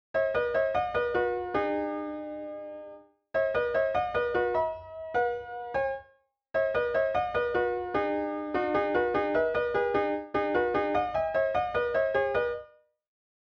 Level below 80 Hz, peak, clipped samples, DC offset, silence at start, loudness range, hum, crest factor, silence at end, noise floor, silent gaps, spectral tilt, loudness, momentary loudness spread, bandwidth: -56 dBFS; -14 dBFS; under 0.1%; under 0.1%; 0.15 s; 3 LU; none; 14 dB; 0.8 s; -65 dBFS; none; -7 dB/octave; -29 LUFS; 9 LU; 6.4 kHz